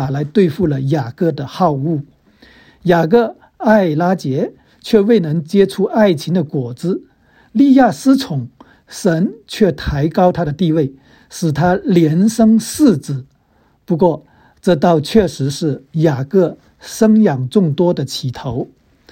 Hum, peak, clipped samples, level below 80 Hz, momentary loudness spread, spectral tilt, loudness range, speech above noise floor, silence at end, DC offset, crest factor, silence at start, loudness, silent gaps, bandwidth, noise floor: none; 0 dBFS; under 0.1%; -42 dBFS; 11 LU; -7 dB/octave; 2 LU; 41 dB; 0.45 s; under 0.1%; 14 dB; 0 s; -15 LUFS; none; 16.5 kHz; -55 dBFS